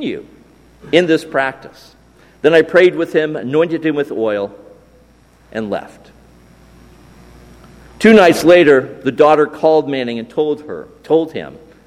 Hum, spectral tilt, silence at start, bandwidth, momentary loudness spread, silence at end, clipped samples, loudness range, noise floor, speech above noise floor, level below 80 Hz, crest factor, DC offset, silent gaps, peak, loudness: none; -5.5 dB/octave; 0 s; 14.5 kHz; 17 LU; 0.3 s; under 0.1%; 14 LU; -48 dBFS; 35 dB; -50 dBFS; 16 dB; under 0.1%; none; 0 dBFS; -14 LUFS